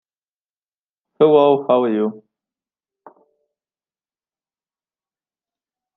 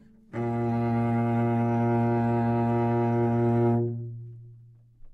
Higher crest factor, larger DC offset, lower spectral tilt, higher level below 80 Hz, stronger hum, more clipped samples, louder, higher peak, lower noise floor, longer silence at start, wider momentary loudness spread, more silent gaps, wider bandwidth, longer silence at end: first, 22 dB vs 10 dB; neither; about the same, -9.5 dB/octave vs -10.5 dB/octave; second, -74 dBFS vs -56 dBFS; neither; neither; first, -16 LUFS vs -26 LUFS; first, 0 dBFS vs -16 dBFS; first, under -90 dBFS vs -52 dBFS; first, 1.2 s vs 0.35 s; second, 9 LU vs 12 LU; neither; about the same, 4 kHz vs 4.2 kHz; first, 3.8 s vs 0.05 s